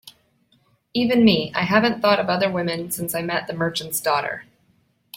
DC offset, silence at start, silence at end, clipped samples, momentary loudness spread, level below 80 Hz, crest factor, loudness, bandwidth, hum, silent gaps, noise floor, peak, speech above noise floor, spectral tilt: under 0.1%; 0.05 s; 0 s; under 0.1%; 9 LU; -60 dBFS; 20 dB; -21 LUFS; 16.5 kHz; none; none; -63 dBFS; -4 dBFS; 43 dB; -4.5 dB/octave